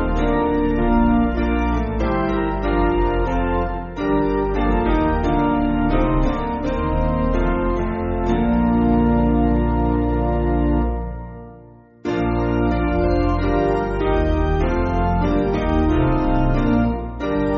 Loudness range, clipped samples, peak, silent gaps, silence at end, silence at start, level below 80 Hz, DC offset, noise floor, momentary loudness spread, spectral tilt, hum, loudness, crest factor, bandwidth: 3 LU; under 0.1%; -4 dBFS; none; 0 s; 0 s; -24 dBFS; under 0.1%; -44 dBFS; 5 LU; -7.5 dB/octave; none; -20 LUFS; 14 dB; 6.8 kHz